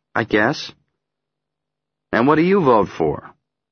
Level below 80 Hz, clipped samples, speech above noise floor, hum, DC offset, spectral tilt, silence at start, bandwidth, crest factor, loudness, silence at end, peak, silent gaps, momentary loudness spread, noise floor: -50 dBFS; under 0.1%; 66 dB; none; under 0.1%; -6.5 dB/octave; 0.15 s; 6.6 kHz; 18 dB; -17 LUFS; 0.45 s; -2 dBFS; none; 14 LU; -82 dBFS